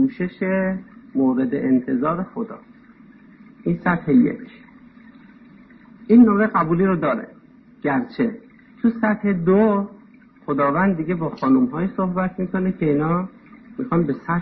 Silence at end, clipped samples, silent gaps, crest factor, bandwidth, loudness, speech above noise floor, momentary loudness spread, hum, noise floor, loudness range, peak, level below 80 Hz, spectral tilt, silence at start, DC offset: 0 s; under 0.1%; none; 16 dB; 4.7 kHz; -20 LUFS; 29 dB; 14 LU; none; -48 dBFS; 4 LU; -4 dBFS; -52 dBFS; -11.5 dB/octave; 0 s; under 0.1%